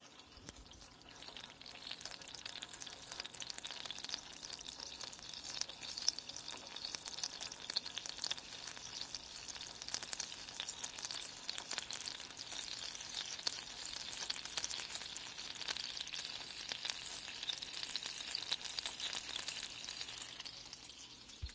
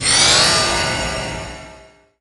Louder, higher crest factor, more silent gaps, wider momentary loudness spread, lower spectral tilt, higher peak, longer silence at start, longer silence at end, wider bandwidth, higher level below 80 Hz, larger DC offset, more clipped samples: second, -43 LUFS vs -14 LUFS; first, 34 dB vs 18 dB; neither; second, 10 LU vs 20 LU; about the same, 0 dB/octave vs -1 dB/octave; second, -14 dBFS vs 0 dBFS; about the same, 0 s vs 0 s; second, 0 s vs 0.4 s; second, 8 kHz vs 11.5 kHz; second, -68 dBFS vs -36 dBFS; neither; neither